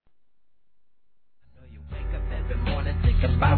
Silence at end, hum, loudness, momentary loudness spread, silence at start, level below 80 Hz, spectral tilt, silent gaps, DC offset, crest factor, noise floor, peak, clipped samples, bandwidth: 0 s; none; -27 LUFS; 16 LU; 1.7 s; -30 dBFS; -10.5 dB/octave; none; 0.3%; 18 dB; -75 dBFS; -8 dBFS; under 0.1%; 4.5 kHz